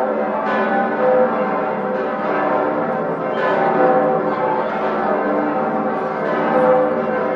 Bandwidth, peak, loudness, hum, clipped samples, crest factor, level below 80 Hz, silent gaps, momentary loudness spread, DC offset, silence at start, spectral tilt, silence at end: 5.8 kHz; -2 dBFS; -18 LUFS; none; under 0.1%; 16 dB; -60 dBFS; none; 6 LU; under 0.1%; 0 s; -8 dB/octave; 0 s